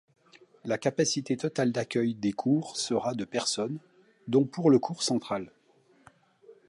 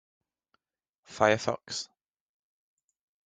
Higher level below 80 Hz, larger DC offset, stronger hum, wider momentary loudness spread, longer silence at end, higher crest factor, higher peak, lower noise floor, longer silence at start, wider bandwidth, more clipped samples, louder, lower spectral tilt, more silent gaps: about the same, -72 dBFS vs -72 dBFS; neither; neither; second, 11 LU vs 19 LU; second, 0.15 s vs 1.4 s; second, 18 dB vs 28 dB; second, -10 dBFS vs -6 dBFS; second, -64 dBFS vs -87 dBFS; second, 0.65 s vs 1.1 s; first, 11.5 kHz vs 9.4 kHz; neither; about the same, -28 LUFS vs -29 LUFS; first, -5 dB/octave vs -3.5 dB/octave; neither